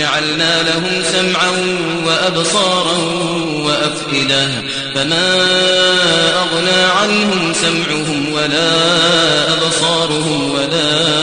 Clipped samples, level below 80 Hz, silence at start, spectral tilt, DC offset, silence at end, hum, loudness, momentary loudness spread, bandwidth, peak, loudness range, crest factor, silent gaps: under 0.1%; -50 dBFS; 0 s; -3 dB/octave; under 0.1%; 0 s; none; -13 LUFS; 6 LU; 10 kHz; 0 dBFS; 2 LU; 14 dB; none